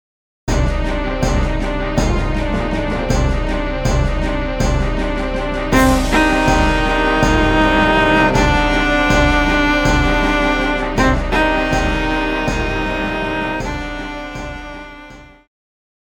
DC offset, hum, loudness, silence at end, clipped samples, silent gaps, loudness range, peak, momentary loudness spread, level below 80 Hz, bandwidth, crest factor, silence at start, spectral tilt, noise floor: under 0.1%; none; -16 LUFS; 0.8 s; under 0.1%; none; 6 LU; 0 dBFS; 9 LU; -22 dBFS; 18 kHz; 14 dB; 0.45 s; -5.5 dB/octave; -38 dBFS